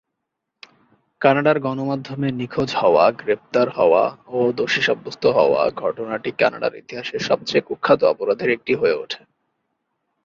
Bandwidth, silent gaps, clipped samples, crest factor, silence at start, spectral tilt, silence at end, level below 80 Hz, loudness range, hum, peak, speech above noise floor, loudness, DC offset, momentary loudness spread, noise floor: 7.6 kHz; none; under 0.1%; 18 dB; 1.2 s; -5.5 dB/octave; 1.1 s; -60 dBFS; 3 LU; none; -2 dBFS; 60 dB; -19 LUFS; under 0.1%; 10 LU; -79 dBFS